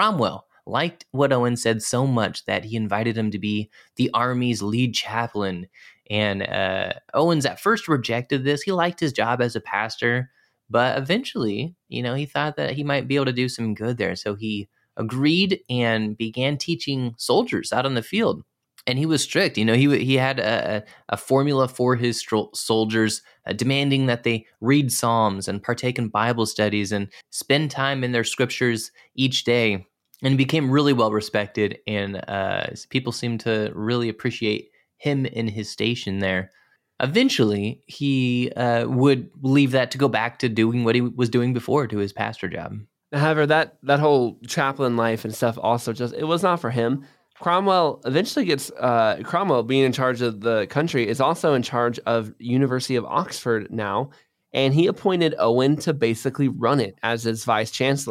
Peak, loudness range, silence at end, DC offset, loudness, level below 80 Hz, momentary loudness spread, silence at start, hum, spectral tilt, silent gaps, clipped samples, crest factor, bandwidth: -6 dBFS; 3 LU; 0 s; under 0.1%; -22 LUFS; -64 dBFS; 8 LU; 0 s; none; -5.5 dB/octave; none; under 0.1%; 16 dB; 15.5 kHz